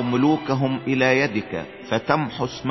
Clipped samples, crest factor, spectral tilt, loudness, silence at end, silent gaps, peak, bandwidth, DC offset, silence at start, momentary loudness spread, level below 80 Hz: under 0.1%; 18 dB; -6.5 dB/octave; -22 LUFS; 0 s; none; -4 dBFS; 6.2 kHz; under 0.1%; 0 s; 9 LU; -54 dBFS